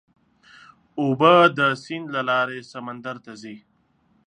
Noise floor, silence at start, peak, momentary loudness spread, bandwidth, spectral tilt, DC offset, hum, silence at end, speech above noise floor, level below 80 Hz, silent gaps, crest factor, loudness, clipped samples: -64 dBFS; 0.95 s; -2 dBFS; 22 LU; 9.6 kHz; -6 dB/octave; under 0.1%; none; 0.7 s; 42 dB; -72 dBFS; none; 22 dB; -19 LUFS; under 0.1%